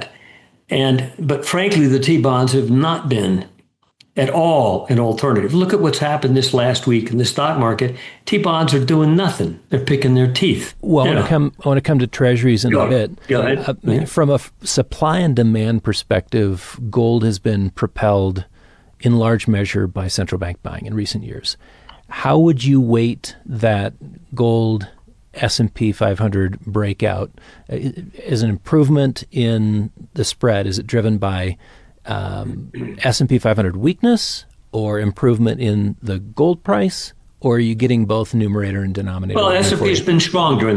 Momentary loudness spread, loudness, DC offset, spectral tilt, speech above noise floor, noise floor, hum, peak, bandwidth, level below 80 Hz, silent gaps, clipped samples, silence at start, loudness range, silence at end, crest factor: 11 LU; -17 LUFS; under 0.1%; -6 dB/octave; 39 dB; -55 dBFS; none; -4 dBFS; 11 kHz; -44 dBFS; none; under 0.1%; 0 s; 4 LU; 0 s; 12 dB